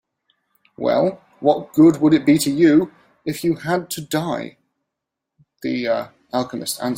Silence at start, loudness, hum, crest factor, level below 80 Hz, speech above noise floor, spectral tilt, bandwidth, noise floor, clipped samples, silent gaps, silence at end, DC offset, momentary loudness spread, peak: 0.8 s; -19 LUFS; none; 18 dB; -60 dBFS; 64 dB; -5.5 dB/octave; 16.5 kHz; -82 dBFS; under 0.1%; none; 0 s; under 0.1%; 14 LU; -2 dBFS